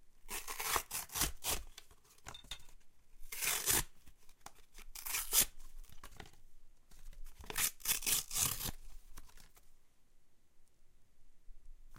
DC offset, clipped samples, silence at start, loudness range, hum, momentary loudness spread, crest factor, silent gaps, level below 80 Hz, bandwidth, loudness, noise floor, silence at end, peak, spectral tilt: under 0.1%; under 0.1%; 0 s; 4 LU; none; 26 LU; 28 dB; none; -54 dBFS; 17 kHz; -36 LUFS; -60 dBFS; 0 s; -12 dBFS; 0 dB/octave